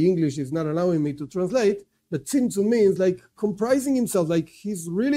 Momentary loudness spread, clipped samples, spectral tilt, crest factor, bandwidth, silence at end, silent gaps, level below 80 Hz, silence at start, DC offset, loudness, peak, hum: 10 LU; under 0.1%; -6.5 dB/octave; 14 dB; 16 kHz; 0 s; none; -60 dBFS; 0 s; under 0.1%; -24 LUFS; -8 dBFS; none